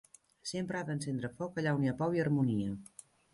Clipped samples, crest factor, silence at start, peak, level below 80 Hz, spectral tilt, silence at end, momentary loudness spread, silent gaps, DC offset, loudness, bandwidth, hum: under 0.1%; 16 dB; 0.45 s; -18 dBFS; -66 dBFS; -6.5 dB/octave; 0.5 s; 14 LU; none; under 0.1%; -35 LUFS; 11.5 kHz; none